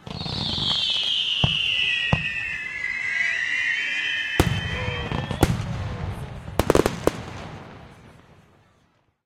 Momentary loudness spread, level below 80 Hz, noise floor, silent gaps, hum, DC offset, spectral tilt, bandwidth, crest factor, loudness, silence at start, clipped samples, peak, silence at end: 12 LU; -38 dBFS; -64 dBFS; none; none; under 0.1%; -4 dB/octave; 16 kHz; 24 dB; -23 LUFS; 0.05 s; under 0.1%; -2 dBFS; 1.15 s